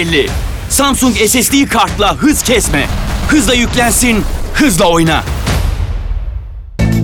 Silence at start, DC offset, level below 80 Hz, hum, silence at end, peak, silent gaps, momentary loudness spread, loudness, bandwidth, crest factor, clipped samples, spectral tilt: 0 s; under 0.1%; -20 dBFS; none; 0 s; 0 dBFS; none; 11 LU; -11 LUFS; 20 kHz; 10 dB; under 0.1%; -4 dB/octave